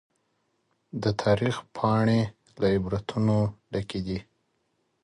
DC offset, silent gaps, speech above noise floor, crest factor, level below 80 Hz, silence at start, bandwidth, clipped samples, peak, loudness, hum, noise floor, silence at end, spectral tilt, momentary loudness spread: under 0.1%; none; 48 dB; 20 dB; -50 dBFS; 0.95 s; 11 kHz; under 0.1%; -8 dBFS; -27 LUFS; none; -74 dBFS; 0.85 s; -7.5 dB/octave; 10 LU